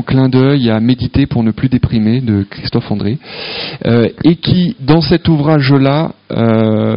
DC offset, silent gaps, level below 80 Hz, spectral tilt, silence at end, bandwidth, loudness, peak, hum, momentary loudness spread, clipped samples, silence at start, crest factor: under 0.1%; none; -34 dBFS; -11 dB/octave; 0 s; 5.4 kHz; -12 LUFS; 0 dBFS; none; 8 LU; 0.1%; 0 s; 12 dB